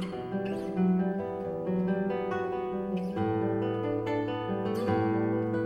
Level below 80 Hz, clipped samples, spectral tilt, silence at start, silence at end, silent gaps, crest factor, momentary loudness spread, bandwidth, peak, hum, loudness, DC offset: -58 dBFS; under 0.1%; -9 dB/octave; 0 s; 0 s; none; 12 dB; 5 LU; 10 kHz; -16 dBFS; none; -31 LUFS; under 0.1%